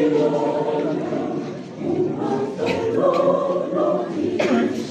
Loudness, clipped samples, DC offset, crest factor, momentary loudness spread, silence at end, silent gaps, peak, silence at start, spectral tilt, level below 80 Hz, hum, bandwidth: -21 LUFS; under 0.1%; under 0.1%; 16 dB; 7 LU; 0 s; none; -6 dBFS; 0 s; -7 dB/octave; -64 dBFS; none; 9.4 kHz